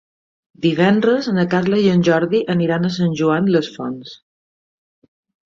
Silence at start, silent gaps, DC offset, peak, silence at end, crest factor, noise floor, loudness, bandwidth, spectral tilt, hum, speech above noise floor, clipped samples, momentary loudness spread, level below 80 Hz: 0.6 s; none; under 0.1%; -2 dBFS; 1.4 s; 16 dB; under -90 dBFS; -17 LUFS; 7.4 kHz; -7 dB/octave; none; over 74 dB; under 0.1%; 12 LU; -58 dBFS